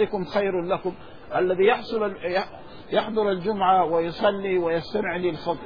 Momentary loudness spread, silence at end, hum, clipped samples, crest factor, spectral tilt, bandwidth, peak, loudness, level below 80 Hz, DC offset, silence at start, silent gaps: 8 LU; 0 s; none; under 0.1%; 16 dB; -7.5 dB/octave; 5.2 kHz; -8 dBFS; -24 LUFS; -54 dBFS; 0.5%; 0 s; none